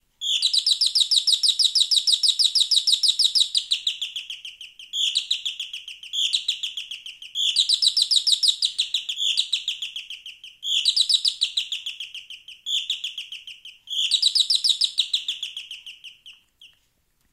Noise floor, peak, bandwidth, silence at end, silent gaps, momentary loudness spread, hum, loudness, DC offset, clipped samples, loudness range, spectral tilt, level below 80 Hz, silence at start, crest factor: -67 dBFS; -6 dBFS; 16 kHz; 0.65 s; none; 18 LU; none; -20 LUFS; under 0.1%; under 0.1%; 7 LU; 6.5 dB/octave; -72 dBFS; 0.2 s; 18 dB